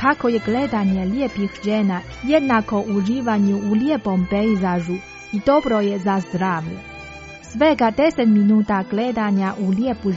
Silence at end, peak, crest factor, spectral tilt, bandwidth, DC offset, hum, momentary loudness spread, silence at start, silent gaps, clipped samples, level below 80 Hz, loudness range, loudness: 0 s; -4 dBFS; 16 dB; -6 dB/octave; 7.8 kHz; under 0.1%; none; 10 LU; 0 s; none; under 0.1%; -46 dBFS; 2 LU; -19 LUFS